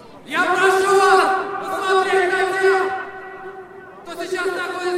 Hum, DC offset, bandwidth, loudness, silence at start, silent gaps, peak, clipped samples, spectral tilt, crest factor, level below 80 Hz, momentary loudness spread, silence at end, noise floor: none; under 0.1%; 14.5 kHz; -18 LUFS; 0 s; none; -2 dBFS; under 0.1%; -2.5 dB/octave; 18 dB; -62 dBFS; 21 LU; 0 s; -38 dBFS